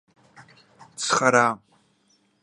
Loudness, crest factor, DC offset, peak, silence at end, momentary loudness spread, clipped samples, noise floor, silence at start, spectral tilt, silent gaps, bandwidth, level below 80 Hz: -21 LUFS; 24 dB; under 0.1%; -2 dBFS; 0.85 s; 19 LU; under 0.1%; -65 dBFS; 0.4 s; -3 dB/octave; none; 11.5 kHz; -72 dBFS